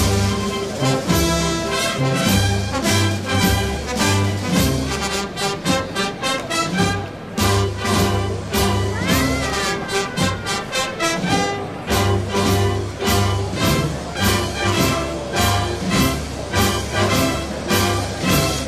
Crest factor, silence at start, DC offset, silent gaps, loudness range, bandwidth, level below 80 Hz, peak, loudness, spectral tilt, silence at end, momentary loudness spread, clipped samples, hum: 14 dB; 0 s; 0.2%; none; 2 LU; 15.5 kHz; -32 dBFS; -4 dBFS; -19 LUFS; -4.5 dB/octave; 0 s; 5 LU; under 0.1%; none